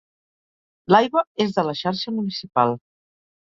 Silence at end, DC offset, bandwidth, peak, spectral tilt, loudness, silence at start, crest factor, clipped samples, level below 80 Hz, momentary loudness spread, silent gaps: 0.65 s; under 0.1%; 7.6 kHz; -2 dBFS; -6.5 dB/octave; -21 LUFS; 0.9 s; 22 dB; under 0.1%; -66 dBFS; 9 LU; 1.27-1.35 s